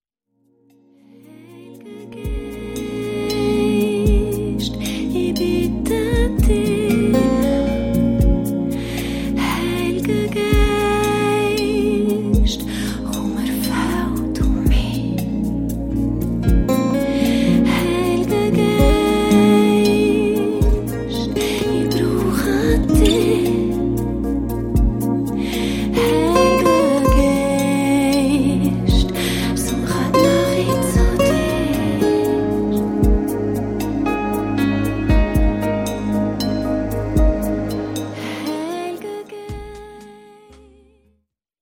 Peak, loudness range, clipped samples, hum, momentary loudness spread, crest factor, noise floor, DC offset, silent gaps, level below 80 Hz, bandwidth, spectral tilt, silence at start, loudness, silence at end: -2 dBFS; 6 LU; under 0.1%; none; 9 LU; 16 dB; -67 dBFS; under 0.1%; none; -24 dBFS; 17 kHz; -6 dB/octave; 1.45 s; -18 LUFS; 1.45 s